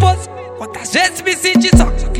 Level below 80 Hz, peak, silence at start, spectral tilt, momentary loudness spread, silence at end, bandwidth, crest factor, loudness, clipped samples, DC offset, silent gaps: -20 dBFS; 0 dBFS; 0 s; -4.5 dB/octave; 17 LU; 0 s; 17.5 kHz; 14 dB; -13 LUFS; 0.7%; under 0.1%; none